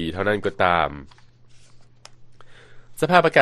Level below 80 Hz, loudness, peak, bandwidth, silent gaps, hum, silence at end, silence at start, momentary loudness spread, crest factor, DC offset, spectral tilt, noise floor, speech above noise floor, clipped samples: -50 dBFS; -20 LUFS; 0 dBFS; 13 kHz; none; none; 0 s; 0 s; 18 LU; 22 dB; under 0.1%; -5.5 dB/octave; -47 dBFS; 27 dB; under 0.1%